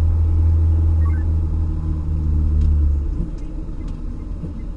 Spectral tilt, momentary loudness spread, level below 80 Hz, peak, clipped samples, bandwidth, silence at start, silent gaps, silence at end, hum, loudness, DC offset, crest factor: -10.5 dB/octave; 14 LU; -20 dBFS; -8 dBFS; under 0.1%; 2.2 kHz; 0 s; none; 0 s; none; -20 LUFS; under 0.1%; 10 dB